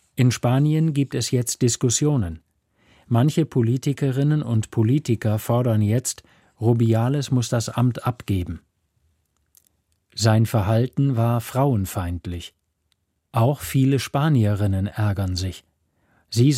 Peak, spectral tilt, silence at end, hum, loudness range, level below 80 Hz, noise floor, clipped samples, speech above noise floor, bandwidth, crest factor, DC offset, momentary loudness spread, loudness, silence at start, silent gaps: -4 dBFS; -6 dB/octave; 0 s; none; 3 LU; -50 dBFS; -71 dBFS; under 0.1%; 51 dB; 15.5 kHz; 18 dB; under 0.1%; 9 LU; -22 LUFS; 0.15 s; none